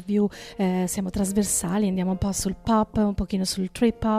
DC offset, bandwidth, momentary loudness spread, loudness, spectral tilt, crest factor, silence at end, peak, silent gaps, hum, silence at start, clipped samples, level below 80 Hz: under 0.1%; 16 kHz; 4 LU; -25 LUFS; -5 dB/octave; 14 dB; 0 s; -10 dBFS; none; none; 0 s; under 0.1%; -42 dBFS